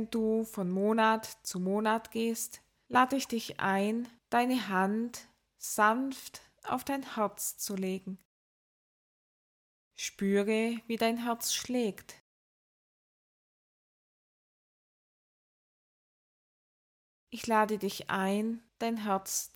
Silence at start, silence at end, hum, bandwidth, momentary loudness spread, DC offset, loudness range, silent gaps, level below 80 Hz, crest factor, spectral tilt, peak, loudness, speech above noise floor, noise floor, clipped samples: 0 s; 0.1 s; none; 18 kHz; 12 LU; under 0.1%; 7 LU; 8.25-9.91 s, 12.21-17.27 s; -74 dBFS; 22 dB; -4 dB/octave; -12 dBFS; -32 LUFS; over 59 dB; under -90 dBFS; under 0.1%